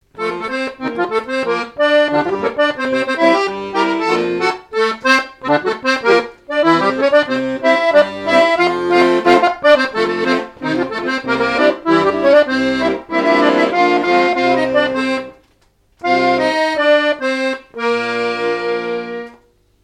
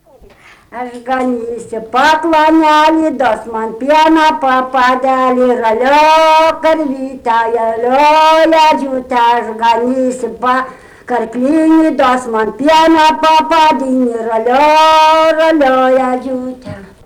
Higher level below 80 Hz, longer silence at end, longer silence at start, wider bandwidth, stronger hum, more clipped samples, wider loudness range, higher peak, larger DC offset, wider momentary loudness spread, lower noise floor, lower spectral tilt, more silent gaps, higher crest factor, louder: second, -54 dBFS vs -46 dBFS; first, 0.5 s vs 0.2 s; second, 0.15 s vs 0.7 s; second, 11 kHz vs 19 kHz; neither; neither; about the same, 3 LU vs 3 LU; first, 0 dBFS vs -4 dBFS; neither; second, 9 LU vs 12 LU; first, -56 dBFS vs -41 dBFS; about the same, -4.5 dB/octave vs -3.5 dB/octave; neither; first, 16 dB vs 6 dB; second, -15 LUFS vs -10 LUFS